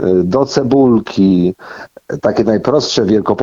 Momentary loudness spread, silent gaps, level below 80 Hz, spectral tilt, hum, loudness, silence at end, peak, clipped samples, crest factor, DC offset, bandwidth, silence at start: 15 LU; none; -46 dBFS; -6.5 dB/octave; none; -13 LUFS; 0 s; 0 dBFS; under 0.1%; 12 dB; under 0.1%; 7.6 kHz; 0 s